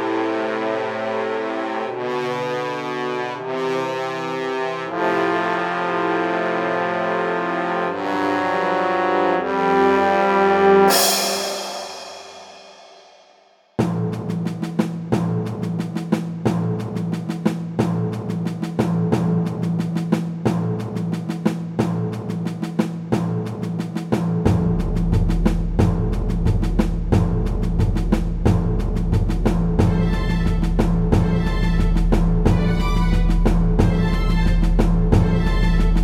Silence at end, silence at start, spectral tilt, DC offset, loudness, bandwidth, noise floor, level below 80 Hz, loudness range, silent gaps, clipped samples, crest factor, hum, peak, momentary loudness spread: 0 s; 0 s; -6 dB/octave; under 0.1%; -21 LUFS; 17 kHz; -54 dBFS; -26 dBFS; 7 LU; none; under 0.1%; 16 dB; none; -2 dBFS; 8 LU